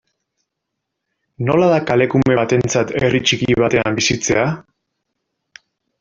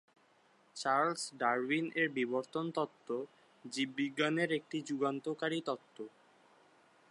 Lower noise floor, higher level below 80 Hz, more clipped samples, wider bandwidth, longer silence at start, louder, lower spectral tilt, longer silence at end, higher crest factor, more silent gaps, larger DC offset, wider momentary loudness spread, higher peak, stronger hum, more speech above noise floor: first, -78 dBFS vs -69 dBFS; first, -46 dBFS vs under -90 dBFS; neither; second, 7.8 kHz vs 11.5 kHz; first, 1.4 s vs 0.75 s; first, -16 LUFS vs -36 LUFS; about the same, -4.5 dB/octave vs -4.5 dB/octave; first, 1.4 s vs 1.05 s; about the same, 16 dB vs 20 dB; neither; neither; second, 4 LU vs 14 LU; first, -2 dBFS vs -18 dBFS; neither; first, 63 dB vs 33 dB